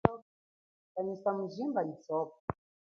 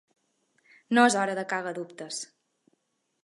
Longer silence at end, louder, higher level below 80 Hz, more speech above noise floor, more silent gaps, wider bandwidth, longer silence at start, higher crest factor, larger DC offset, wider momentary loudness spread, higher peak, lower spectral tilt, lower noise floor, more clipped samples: second, 0.45 s vs 1 s; second, -36 LUFS vs -27 LUFS; first, -60 dBFS vs -84 dBFS; first, over 55 dB vs 49 dB; first, 0.22-0.95 s, 2.40-2.48 s vs none; second, 6.8 kHz vs 11.5 kHz; second, 0.05 s vs 0.9 s; first, 32 dB vs 24 dB; neither; second, 10 LU vs 16 LU; about the same, -4 dBFS vs -6 dBFS; first, -7.5 dB/octave vs -3 dB/octave; first, under -90 dBFS vs -75 dBFS; neither